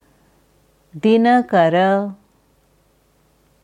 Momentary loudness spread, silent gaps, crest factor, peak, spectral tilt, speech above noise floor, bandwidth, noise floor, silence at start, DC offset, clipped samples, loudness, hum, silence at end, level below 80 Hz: 8 LU; none; 16 dB; -4 dBFS; -7.5 dB/octave; 44 dB; 9.8 kHz; -58 dBFS; 0.95 s; under 0.1%; under 0.1%; -15 LUFS; none; 1.5 s; -64 dBFS